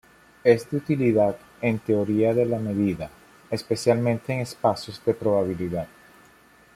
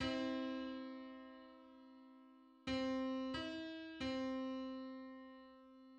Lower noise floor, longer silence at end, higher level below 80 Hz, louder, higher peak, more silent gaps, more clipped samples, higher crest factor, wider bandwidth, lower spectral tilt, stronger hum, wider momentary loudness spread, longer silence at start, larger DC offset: second, -54 dBFS vs -65 dBFS; first, 0.9 s vs 0 s; first, -58 dBFS vs -70 dBFS; first, -24 LUFS vs -45 LUFS; first, -4 dBFS vs -28 dBFS; neither; neither; about the same, 20 dB vs 18 dB; first, 15 kHz vs 8.6 kHz; first, -7 dB/octave vs -5 dB/octave; neither; second, 10 LU vs 21 LU; first, 0.45 s vs 0 s; neither